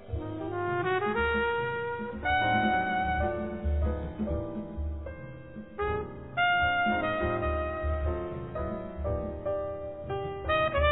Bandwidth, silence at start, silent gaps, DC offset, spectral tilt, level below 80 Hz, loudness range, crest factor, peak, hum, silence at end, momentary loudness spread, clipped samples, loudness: 4 kHz; 0 s; none; 0.2%; -10 dB/octave; -38 dBFS; 4 LU; 18 dB; -12 dBFS; none; 0 s; 11 LU; under 0.1%; -30 LUFS